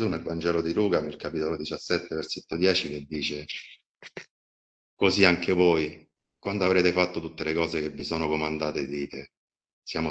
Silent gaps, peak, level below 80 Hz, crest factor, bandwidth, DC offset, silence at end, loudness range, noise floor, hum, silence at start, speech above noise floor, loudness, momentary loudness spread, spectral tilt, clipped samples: 3.86-3.95 s, 4.30-4.97 s, 9.37-9.48 s, 9.73-9.82 s; -2 dBFS; -54 dBFS; 26 dB; 8.4 kHz; under 0.1%; 0 s; 5 LU; under -90 dBFS; none; 0 s; over 63 dB; -27 LUFS; 15 LU; -5 dB/octave; under 0.1%